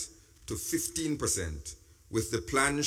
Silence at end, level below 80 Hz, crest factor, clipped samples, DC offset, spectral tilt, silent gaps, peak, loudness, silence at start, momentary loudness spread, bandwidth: 0 s; -48 dBFS; 22 dB; under 0.1%; under 0.1%; -3.5 dB/octave; none; -12 dBFS; -32 LUFS; 0 s; 16 LU; 17.5 kHz